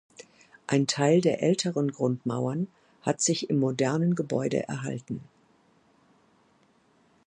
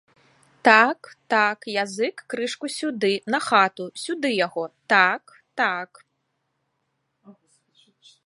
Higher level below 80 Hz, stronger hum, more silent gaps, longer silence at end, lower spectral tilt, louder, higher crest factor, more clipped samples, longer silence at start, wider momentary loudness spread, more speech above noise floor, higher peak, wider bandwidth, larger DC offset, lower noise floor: first, -70 dBFS vs -78 dBFS; neither; neither; first, 2.05 s vs 0.95 s; first, -5 dB/octave vs -3.5 dB/octave; second, -27 LUFS vs -22 LUFS; about the same, 20 dB vs 24 dB; neither; second, 0.2 s vs 0.65 s; second, 12 LU vs 15 LU; second, 38 dB vs 53 dB; second, -8 dBFS vs 0 dBFS; about the same, 11 kHz vs 11.5 kHz; neither; second, -64 dBFS vs -75 dBFS